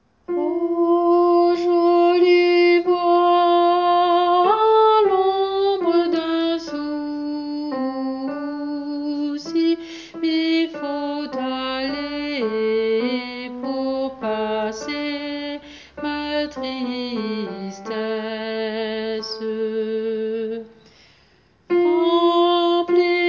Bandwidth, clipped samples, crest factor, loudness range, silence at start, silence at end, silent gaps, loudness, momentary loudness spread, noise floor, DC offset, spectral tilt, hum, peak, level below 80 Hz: 7 kHz; under 0.1%; 14 dB; 10 LU; 0.3 s; 0 s; none; -20 LUFS; 12 LU; -57 dBFS; under 0.1%; -5 dB/octave; none; -6 dBFS; -60 dBFS